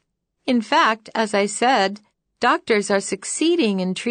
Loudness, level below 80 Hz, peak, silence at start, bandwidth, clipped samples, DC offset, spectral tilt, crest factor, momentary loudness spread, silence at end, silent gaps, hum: -20 LUFS; -70 dBFS; -6 dBFS; 0.45 s; 9.6 kHz; under 0.1%; under 0.1%; -3.5 dB/octave; 14 dB; 6 LU; 0 s; none; none